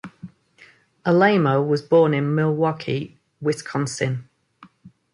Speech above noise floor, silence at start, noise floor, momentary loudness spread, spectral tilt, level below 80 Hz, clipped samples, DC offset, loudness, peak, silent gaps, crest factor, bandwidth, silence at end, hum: 33 dB; 0.05 s; -53 dBFS; 12 LU; -6.5 dB/octave; -64 dBFS; under 0.1%; under 0.1%; -21 LUFS; -4 dBFS; none; 18 dB; 11.5 kHz; 0.25 s; none